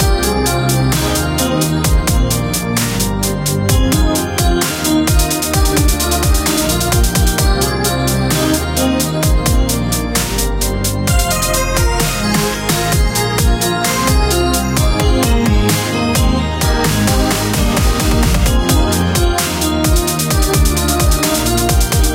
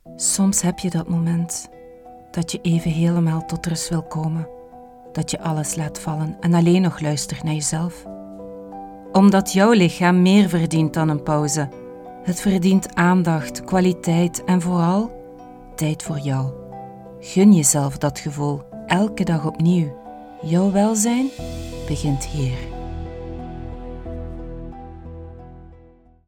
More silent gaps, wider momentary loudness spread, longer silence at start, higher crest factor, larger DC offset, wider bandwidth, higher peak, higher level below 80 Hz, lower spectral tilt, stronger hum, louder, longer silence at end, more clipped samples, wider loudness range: neither; second, 2 LU vs 21 LU; about the same, 0 s vs 0.05 s; second, 12 dB vs 20 dB; neither; about the same, 17 kHz vs 17 kHz; about the same, 0 dBFS vs -2 dBFS; first, -18 dBFS vs -42 dBFS; second, -4 dB/octave vs -5.5 dB/octave; neither; first, -14 LUFS vs -20 LUFS; second, 0 s vs 0.55 s; neither; second, 1 LU vs 8 LU